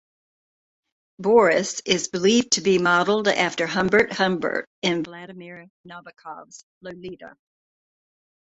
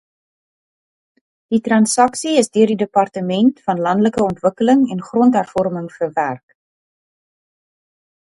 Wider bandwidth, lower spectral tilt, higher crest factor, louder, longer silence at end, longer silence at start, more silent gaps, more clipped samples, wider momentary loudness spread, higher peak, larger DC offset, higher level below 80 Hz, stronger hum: second, 8.2 kHz vs 11.5 kHz; second, -3.5 dB/octave vs -5 dB/octave; about the same, 20 dB vs 18 dB; second, -20 LUFS vs -16 LUFS; second, 1.15 s vs 2 s; second, 1.2 s vs 1.5 s; first, 4.67-4.82 s, 5.70-5.84 s, 6.63-6.81 s vs none; neither; first, 22 LU vs 7 LU; second, -4 dBFS vs 0 dBFS; neither; about the same, -62 dBFS vs -58 dBFS; neither